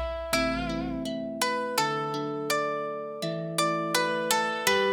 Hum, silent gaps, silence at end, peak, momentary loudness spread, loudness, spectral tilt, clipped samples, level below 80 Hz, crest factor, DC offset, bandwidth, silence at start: none; none; 0 s; -8 dBFS; 8 LU; -28 LUFS; -3 dB/octave; under 0.1%; -48 dBFS; 20 dB; under 0.1%; 17 kHz; 0 s